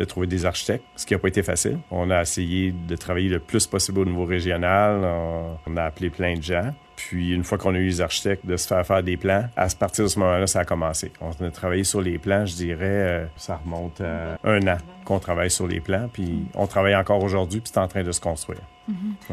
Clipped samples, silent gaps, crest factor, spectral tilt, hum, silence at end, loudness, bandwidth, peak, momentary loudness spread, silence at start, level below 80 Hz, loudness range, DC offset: under 0.1%; none; 18 dB; -4.5 dB/octave; none; 0 s; -24 LUFS; 14 kHz; -6 dBFS; 10 LU; 0 s; -46 dBFS; 3 LU; under 0.1%